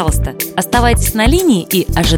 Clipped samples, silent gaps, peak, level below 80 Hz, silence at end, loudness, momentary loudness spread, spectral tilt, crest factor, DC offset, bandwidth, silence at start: under 0.1%; none; 0 dBFS; -20 dBFS; 0 s; -13 LUFS; 6 LU; -4.5 dB/octave; 12 dB; under 0.1%; 18.5 kHz; 0 s